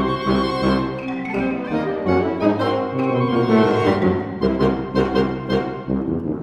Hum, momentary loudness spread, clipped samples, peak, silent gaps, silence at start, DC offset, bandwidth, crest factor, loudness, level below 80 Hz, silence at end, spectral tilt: none; 6 LU; under 0.1%; -2 dBFS; none; 0 s; under 0.1%; 10.5 kHz; 16 dB; -20 LUFS; -40 dBFS; 0 s; -8 dB/octave